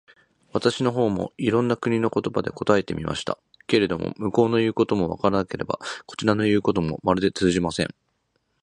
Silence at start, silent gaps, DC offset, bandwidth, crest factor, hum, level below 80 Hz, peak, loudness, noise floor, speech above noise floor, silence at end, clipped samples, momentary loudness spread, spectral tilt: 0.55 s; none; under 0.1%; 11 kHz; 20 dB; none; -50 dBFS; -2 dBFS; -24 LUFS; -72 dBFS; 49 dB; 0.75 s; under 0.1%; 8 LU; -6 dB/octave